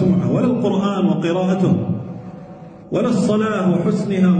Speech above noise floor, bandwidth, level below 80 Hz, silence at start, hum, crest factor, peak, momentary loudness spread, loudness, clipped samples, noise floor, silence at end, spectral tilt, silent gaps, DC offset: 21 dB; 9.2 kHz; -52 dBFS; 0 s; none; 12 dB; -6 dBFS; 17 LU; -18 LUFS; under 0.1%; -37 dBFS; 0 s; -8 dB/octave; none; under 0.1%